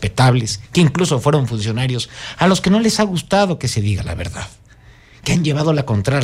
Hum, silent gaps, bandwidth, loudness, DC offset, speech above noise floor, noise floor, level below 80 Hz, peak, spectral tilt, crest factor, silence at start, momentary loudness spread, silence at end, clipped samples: none; none; 15 kHz; -17 LUFS; under 0.1%; 29 dB; -45 dBFS; -40 dBFS; -2 dBFS; -5.5 dB/octave; 14 dB; 0 s; 11 LU; 0 s; under 0.1%